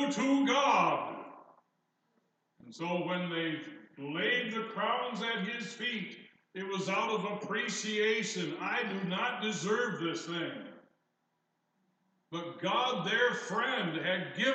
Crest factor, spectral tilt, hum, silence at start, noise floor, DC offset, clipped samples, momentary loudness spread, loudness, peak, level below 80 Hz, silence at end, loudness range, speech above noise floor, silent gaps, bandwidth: 18 dB; -4 dB/octave; none; 0 s; -80 dBFS; under 0.1%; under 0.1%; 13 LU; -33 LUFS; -16 dBFS; under -90 dBFS; 0 s; 5 LU; 47 dB; none; 9 kHz